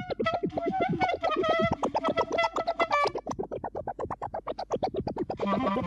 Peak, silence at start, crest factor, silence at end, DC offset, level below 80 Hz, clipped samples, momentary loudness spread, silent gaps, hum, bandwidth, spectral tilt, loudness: -12 dBFS; 0 s; 18 dB; 0 s; under 0.1%; -54 dBFS; under 0.1%; 10 LU; none; none; 10.5 kHz; -6 dB/octave; -29 LUFS